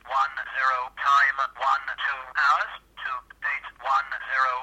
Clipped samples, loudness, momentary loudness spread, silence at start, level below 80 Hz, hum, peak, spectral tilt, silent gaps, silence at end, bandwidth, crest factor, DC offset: under 0.1%; -25 LUFS; 12 LU; 0.05 s; -62 dBFS; none; -10 dBFS; 0 dB/octave; none; 0 s; 10.5 kHz; 16 dB; under 0.1%